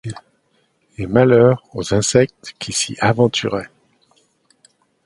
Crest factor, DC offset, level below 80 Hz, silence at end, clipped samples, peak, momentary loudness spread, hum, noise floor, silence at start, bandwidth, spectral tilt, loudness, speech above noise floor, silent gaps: 18 dB; under 0.1%; -48 dBFS; 1.4 s; under 0.1%; 0 dBFS; 18 LU; none; -63 dBFS; 0.05 s; 11.5 kHz; -5 dB/octave; -16 LUFS; 47 dB; none